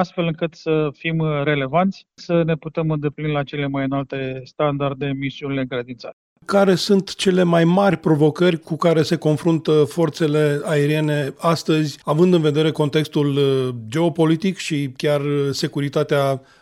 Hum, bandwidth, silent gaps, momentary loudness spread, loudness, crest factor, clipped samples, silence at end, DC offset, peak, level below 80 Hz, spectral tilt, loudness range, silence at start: none; 14 kHz; 6.13-6.36 s; 8 LU; -19 LUFS; 16 dB; under 0.1%; 0.25 s; under 0.1%; -4 dBFS; -56 dBFS; -6.5 dB/octave; 5 LU; 0 s